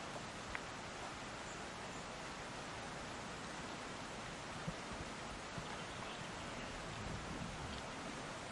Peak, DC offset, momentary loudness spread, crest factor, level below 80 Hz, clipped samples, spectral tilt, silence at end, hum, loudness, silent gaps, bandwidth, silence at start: -22 dBFS; under 0.1%; 1 LU; 24 dB; -60 dBFS; under 0.1%; -3.5 dB/octave; 0 s; none; -47 LUFS; none; 11.5 kHz; 0 s